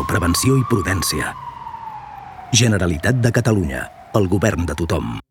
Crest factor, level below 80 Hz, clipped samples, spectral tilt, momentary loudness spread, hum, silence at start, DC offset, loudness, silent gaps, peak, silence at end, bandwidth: 18 dB; -38 dBFS; under 0.1%; -5 dB/octave; 16 LU; none; 0 s; under 0.1%; -18 LUFS; none; 0 dBFS; 0.1 s; 18 kHz